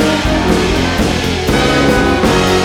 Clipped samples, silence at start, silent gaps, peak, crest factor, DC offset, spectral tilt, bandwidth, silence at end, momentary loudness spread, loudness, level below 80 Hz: under 0.1%; 0 s; none; 0 dBFS; 12 dB; under 0.1%; -5 dB/octave; over 20 kHz; 0 s; 3 LU; -12 LUFS; -24 dBFS